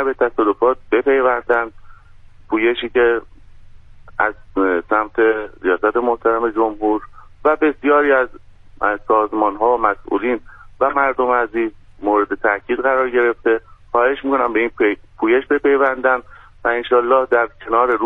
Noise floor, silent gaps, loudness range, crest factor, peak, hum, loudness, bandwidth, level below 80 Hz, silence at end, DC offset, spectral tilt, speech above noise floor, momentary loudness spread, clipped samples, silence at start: -42 dBFS; none; 2 LU; 16 dB; 0 dBFS; none; -17 LUFS; 4 kHz; -46 dBFS; 0 s; under 0.1%; -7 dB/octave; 25 dB; 7 LU; under 0.1%; 0 s